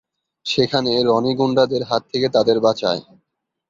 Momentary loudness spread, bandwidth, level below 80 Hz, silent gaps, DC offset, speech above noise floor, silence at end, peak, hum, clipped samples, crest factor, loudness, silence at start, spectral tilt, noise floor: 6 LU; 7.6 kHz; -60 dBFS; none; under 0.1%; 55 dB; 0.7 s; -2 dBFS; none; under 0.1%; 16 dB; -18 LUFS; 0.45 s; -5.5 dB/octave; -73 dBFS